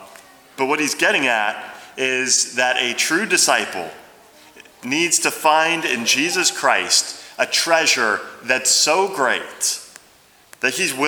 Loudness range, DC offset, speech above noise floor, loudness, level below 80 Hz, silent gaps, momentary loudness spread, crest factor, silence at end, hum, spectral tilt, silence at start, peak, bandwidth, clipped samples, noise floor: 2 LU; under 0.1%; 33 dB; -17 LUFS; -70 dBFS; none; 9 LU; 20 dB; 0 s; none; -0.5 dB/octave; 0 s; 0 dBFS; over 20 kHz; under 0.1%; -52 dBFS